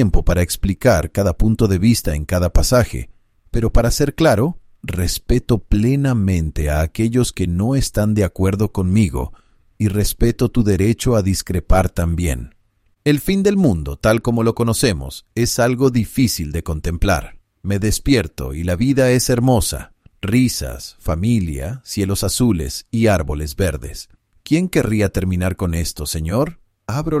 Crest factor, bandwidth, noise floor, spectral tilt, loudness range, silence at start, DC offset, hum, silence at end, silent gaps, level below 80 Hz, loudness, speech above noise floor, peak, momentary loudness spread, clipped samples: 16 dB; 16 kHz; -59 dBFS; -6 dB/octave; 2 LU; 0 s; under 0.1%; none; 0 s; none; -26 dBFS; -18 LUFS; 43 dB; -2 dBFS; 9 LU; under 0.1%